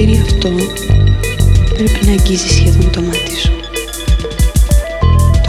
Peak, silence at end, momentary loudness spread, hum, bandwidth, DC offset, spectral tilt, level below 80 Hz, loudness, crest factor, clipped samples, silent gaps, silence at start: 0 dBFS; 0 s; 6 LU; none; 15 kHz; under 0.1%; -5.5 dB/octave; -14 dBFS; -13 LUFS; 10 dB; under 0.1%; none; 0 s